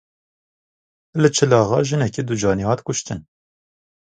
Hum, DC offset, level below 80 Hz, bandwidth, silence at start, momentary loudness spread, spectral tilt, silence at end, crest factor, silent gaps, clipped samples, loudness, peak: none; under 0.1%; -50 dBFS; 9.4 kHz; 1.15 s; 13 LU; -5 dB/octave; 0.95 s; 20 dB; none; under 0.1%; -19 LUFS; 0 dBFS